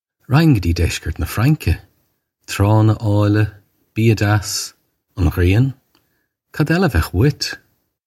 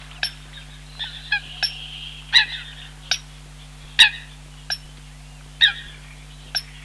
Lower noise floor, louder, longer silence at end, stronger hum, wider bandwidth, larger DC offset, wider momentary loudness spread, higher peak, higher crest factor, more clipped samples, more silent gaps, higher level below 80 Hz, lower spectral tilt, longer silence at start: first, -67 dBFS vs -41 dBFS; first, -17 LUFS vs -20 LUFS; first, 0.5 s vs 0 s; neither; about the same, 14.5 kHz vs 13.5 kHz; neither; second, 11 LU vs 27 LU; about the same, -2 dBFS vs -2 dBFS; second, 16 dB vs 24 dB; neither; neither; first, -32 dBFS vs -44 dBFS; first, -6 dB/octave vs 0 dB/octave; first, 0.3 s vs 0 s